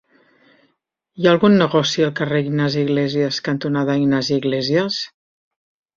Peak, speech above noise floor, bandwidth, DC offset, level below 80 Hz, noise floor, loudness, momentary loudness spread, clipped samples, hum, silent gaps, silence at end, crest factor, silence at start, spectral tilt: -2 dBFS; 52 dB; 7.6 kHz; under 0.1%; -58 dBFS; -70 dBFS; -18 LUFS; 7 LU; under 0.1%; none; none; 0.9 s; 18 dB; 1.15 s; -6 dB/octave